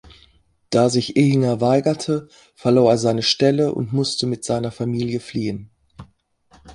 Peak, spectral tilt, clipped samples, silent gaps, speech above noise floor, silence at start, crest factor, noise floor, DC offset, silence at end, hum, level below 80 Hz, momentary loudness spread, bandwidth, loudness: -2 dBFS; -6 dB/octave; under 0.1%; none; 39 dB; 0.7 s; 18 dB; -57 dBFS; under 0.1%; 0 s; none; -54 dBFS; 9 LU; 11.5 kHz; -19 LUFS